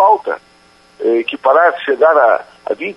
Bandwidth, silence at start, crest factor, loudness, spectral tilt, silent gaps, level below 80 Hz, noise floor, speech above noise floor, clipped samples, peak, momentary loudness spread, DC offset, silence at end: 5.8 kHz; 0 s; 14 dB; -13 LUFS; -5 dB/octave; none; -64 dBFS; -48 dBFS; 35 dB; under 0.1%; 0 dBFS; 13 LU; under 0.1%; 0.05 s